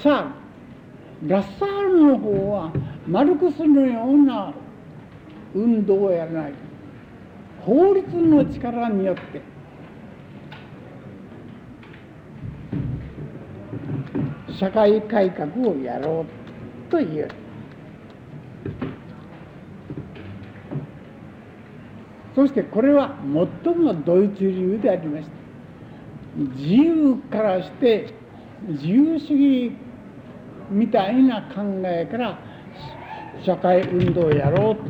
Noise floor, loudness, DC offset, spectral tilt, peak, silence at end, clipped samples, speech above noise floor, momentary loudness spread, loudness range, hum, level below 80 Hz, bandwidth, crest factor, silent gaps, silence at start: -42 dBFS; -20 LUFS; under 0.1%; -9.5 dB/octave; -6 dBFS; 0 s; under 0.1%; 23 dB; 24 LU; 16 LU; none; -52 dBFS; 5.2 kHz; 16 dB; none; 0 s